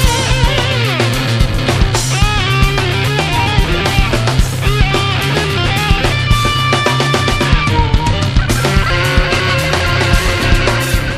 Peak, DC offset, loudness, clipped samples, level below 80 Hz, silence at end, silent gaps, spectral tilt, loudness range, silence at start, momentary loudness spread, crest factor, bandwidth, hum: 0 dBFS; under 0.1%; -13 LUFS; under 0.1%; -18 dBFS; 0 s; none; -4.5 dB/octave; 1 LU; 0 s; 2 LU; 12 dB; 15.5 kHz; none